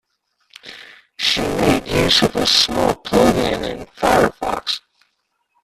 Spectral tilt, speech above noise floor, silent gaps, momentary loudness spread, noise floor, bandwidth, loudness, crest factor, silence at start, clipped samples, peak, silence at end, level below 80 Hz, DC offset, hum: -3.5 dB/octave; 52 dB; none; 12 LU; -69 dBFS; 15.5 kHz; -17 LUFS; 16 dB; 0.65 s; under 0.1%; -2 dBFS; 0.85 s; -40 dBFS; under 0.1%; none